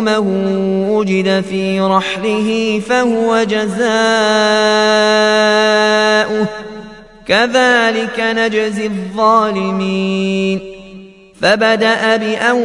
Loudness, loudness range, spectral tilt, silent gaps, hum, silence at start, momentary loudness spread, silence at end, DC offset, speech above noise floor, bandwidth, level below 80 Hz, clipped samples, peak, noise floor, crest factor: -13 LUFS; 3 LU; -4.5 dB/octave; none; none; 0 s; 7 LU; 0 s; under 0.1%; 23 dB; 11.5 kHz; -48 dBFS; under 0.1%; 0 dBFS; -36 dBFS; 14 dB